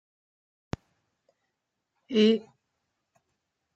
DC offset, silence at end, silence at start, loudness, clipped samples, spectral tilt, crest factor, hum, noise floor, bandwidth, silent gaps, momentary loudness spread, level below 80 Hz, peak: under 0.1%; 1.35 s; 2.1 s; -25 LUFS; under 0.1%; -6.5 dB/octave; 22 dB; none; -83 dBFS; 7.8 kHz; none; 18 LU; -64 dBFS; -10 dBFS